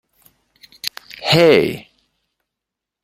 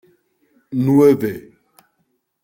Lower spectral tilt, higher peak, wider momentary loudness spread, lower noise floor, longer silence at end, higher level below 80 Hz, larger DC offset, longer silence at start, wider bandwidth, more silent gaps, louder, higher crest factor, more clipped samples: second, -5 dB/octave vs -8.5 dB/octave; about the same, 0 dBFS vs -2 dBFS; about the same, 16 LU vs 15 LU; first, -84 dBFS vs -68 dBFS; first, 1.2 s vs 1.05 s; about the same, -56 dBFS vs -60 dBFS; neither; first, 0.85 s vs 0.7 s; about the same, 16.5 kHz vs 16.5 kHz; neither; about the same, -16 LUFS vs -16 LUFS; about the same, 20 dB vs 16 dB; neither